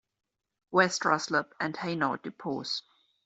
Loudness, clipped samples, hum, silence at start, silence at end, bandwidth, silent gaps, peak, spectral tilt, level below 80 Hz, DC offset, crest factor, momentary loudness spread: -30 LUFS; under 0.1%; none; 0.7 s; 0.45 s; 8.2 kHz; none; -8 dBFS; -3.5 dB/octave; -74 dBFS; under 0.1%; 24 dB; 10 LU